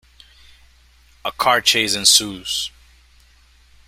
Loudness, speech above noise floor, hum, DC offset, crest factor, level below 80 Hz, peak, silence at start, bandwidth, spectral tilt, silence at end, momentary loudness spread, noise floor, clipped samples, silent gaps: -15 LUFS; 34 dB; none; under 0.1%; 22 dB; -52 dBFS; 0 dBFS; 1.25 s; 16 kHz; 0 dB/octave; 1.2 s; 17 LU; -52 dBFS; under 0.1%; none